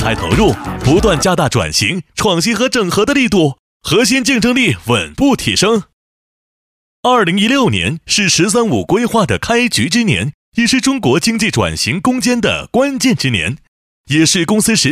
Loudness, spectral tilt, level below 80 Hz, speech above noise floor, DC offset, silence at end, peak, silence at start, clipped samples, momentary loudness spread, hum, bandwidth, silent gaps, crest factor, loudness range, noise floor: -13 LUFS; -4 dB/octave; -34 dBFS; over 77 dB; under 0.1%; 0 s; 0 dBFS; 0 s; under 0.1%; 5 LU; none; 16 kHz; 3.59-3.80 s, 5.93-7.03 s, 10.34-10.52 s, 13.68-14.04 s; 14 dB; 2 LU; under -90 dBFS